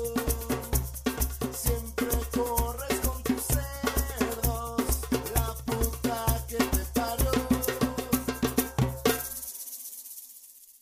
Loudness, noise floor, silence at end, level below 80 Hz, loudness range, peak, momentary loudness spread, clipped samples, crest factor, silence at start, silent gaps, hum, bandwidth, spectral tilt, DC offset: -29 LUFS; -51 dBFS; 0.1 s; -36 dBFS; 2 LU; -10 dBFS; 9 LU; under 0.1%; 20 dB; 0 s; none; none; 16 kHz; -4.5 dB/octave; under 0.1%